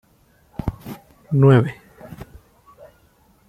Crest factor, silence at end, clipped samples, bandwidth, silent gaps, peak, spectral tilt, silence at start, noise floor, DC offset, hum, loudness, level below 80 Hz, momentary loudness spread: 20 dB; 1.25 s; under 0.1%; 13.5 kHz; none; -2 dBFS; -9 dB/octave; 0.65 s; -57 dBFS; under 0.1%; none; -18 LUFS; -44 dBFS; 27 LU